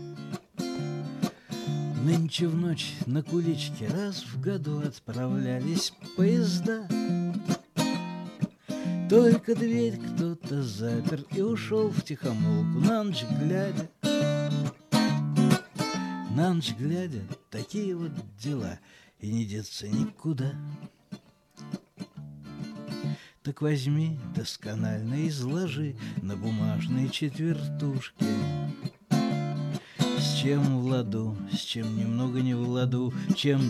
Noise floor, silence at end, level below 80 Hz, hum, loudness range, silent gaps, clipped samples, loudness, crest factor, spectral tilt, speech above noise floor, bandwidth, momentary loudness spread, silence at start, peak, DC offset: -50 dBFS; 0 s; -66 dBFS; none; 7 LU; none; under 0.1%; -29 LUFS; 20 dB; -6.5 dB/octave; 22 dB; 14.5 kHz; 12 LU; 0 s; -8 dBFS; under 0.1%